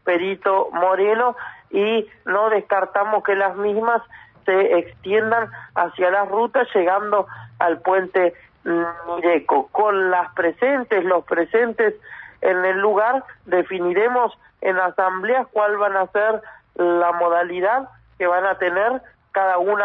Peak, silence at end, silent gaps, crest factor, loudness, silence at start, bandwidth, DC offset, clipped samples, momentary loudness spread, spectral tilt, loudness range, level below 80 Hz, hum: -4 dBFS; 0 s; none; 16 dB; -20 LUFS; 0.05 s; 4.1 kHz; under 0.1%; under 0.1%; 6 LU; -7.5 dB/octave; 1 LU; -64 dBFS; none